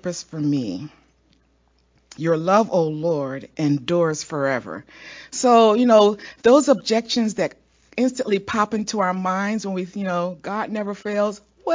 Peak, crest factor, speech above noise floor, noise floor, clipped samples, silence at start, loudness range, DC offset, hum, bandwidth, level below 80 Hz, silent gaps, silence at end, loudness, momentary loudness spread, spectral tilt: -2 dBFS; 20 dB; 41 dB; -62 dBFS; under 0.1%; 0.05 s; 6 LU; under 0.1%; none; 7.6 kHz; -62 dBFS; none; 0 s; -21 LUFS; 15 LU; -5 dB/octave